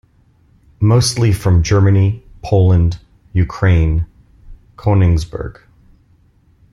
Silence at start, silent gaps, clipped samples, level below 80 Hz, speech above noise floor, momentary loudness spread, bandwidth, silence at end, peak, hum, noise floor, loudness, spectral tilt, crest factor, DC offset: 0.8 s; none; under 0.1%; -30 dBFS; 40 dB; 15 LU; 12.5 kHz; 1.2 s; -2 dBFS; none; -52 dBFS; -15 LUFS; -6.5 dB/octave; 14 dB; under 0.1%